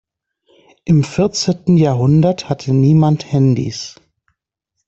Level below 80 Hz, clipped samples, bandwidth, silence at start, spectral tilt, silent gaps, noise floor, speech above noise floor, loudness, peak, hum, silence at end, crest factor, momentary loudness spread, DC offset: -48 dBFS; under 0.1%; 8 kHz; 0.85 s; -7 dB/octave; none; -75 dBFS; 61 dB; -14 LUFS; 0 dBFS; none; 0.95 s; 14 dB; 11 LU; under 0.1%